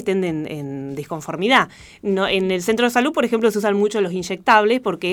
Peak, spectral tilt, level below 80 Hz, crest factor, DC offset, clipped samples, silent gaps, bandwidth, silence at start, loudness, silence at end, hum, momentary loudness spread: 0 dBFS; -4.5 dB/octave; -56 dBFS; 18 dB; under 0.1%; under 0.1%; none; 18.5 kHz; 0 s; -19 LUFS; 0 s; none; 13 LU